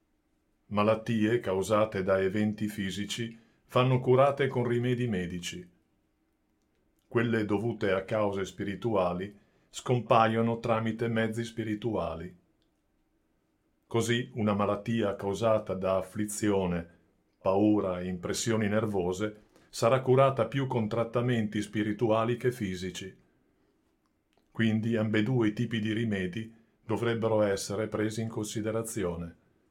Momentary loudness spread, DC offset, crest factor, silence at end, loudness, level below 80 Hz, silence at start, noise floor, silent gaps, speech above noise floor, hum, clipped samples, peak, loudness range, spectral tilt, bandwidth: 11 LU; under 0.1%; 22 dB; 0.4 s; -29 LUFS; -62 dBFS; 0.7 s; -73 dBFS; none; 45 dB; none; under 0.1%; -8 dBFS; 5 LU; -6 dB/octave; 16.5 kHz